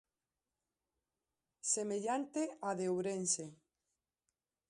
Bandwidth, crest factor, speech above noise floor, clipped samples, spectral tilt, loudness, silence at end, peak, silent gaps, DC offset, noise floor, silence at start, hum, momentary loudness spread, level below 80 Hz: 11 kHz; 20 dB; over 52 dB; under 0.1%; -3.5 dB/octave; -38 LUFS; 1.15 s; -22 dBFS; none; under 0.1%; under -90 dBFS; 1.65 s; none; 5 LU; -86 dBFS